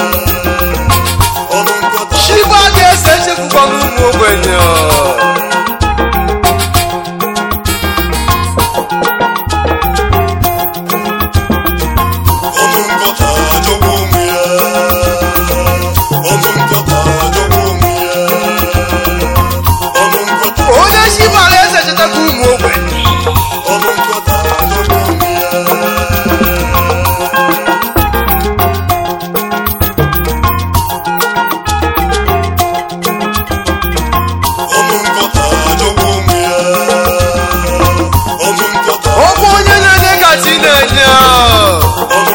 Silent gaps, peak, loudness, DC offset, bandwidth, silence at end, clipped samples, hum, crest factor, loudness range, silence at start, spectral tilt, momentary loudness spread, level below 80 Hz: none; 0 dBFS; -9 LUFS; under 0.1%; 18 kHz; 0 s; 0.4%; none; 10 dB; 5 LU; 0 s; -4 dB/octave; 7 LU; -20 dBFS